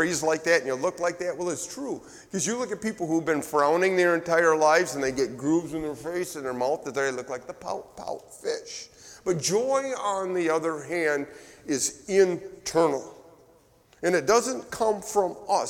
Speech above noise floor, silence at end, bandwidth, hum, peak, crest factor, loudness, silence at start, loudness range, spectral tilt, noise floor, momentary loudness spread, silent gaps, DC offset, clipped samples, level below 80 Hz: 33 dB; 0 s; 17.5 kHz; none; -8 dBFS; 18 dB; -26 LUFS; 0 s; 6 LU; -3.5 dB/octave; -59 dBFS; 13 LU; none; under 0.1%; under 0.1%; -62 dBFS